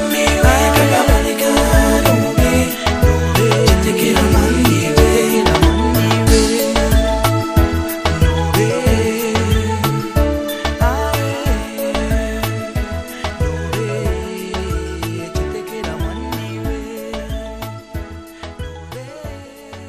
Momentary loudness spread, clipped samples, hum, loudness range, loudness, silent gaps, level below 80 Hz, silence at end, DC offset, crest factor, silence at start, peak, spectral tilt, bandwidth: 16 LU; under 0.1%; none; 12 LU; -16 LUFS; none; -22 dBFS; 0 s; under 0.1%; 16 dB; 0 s; 0 dBFS; -5 dB/octave; 15.5 kHz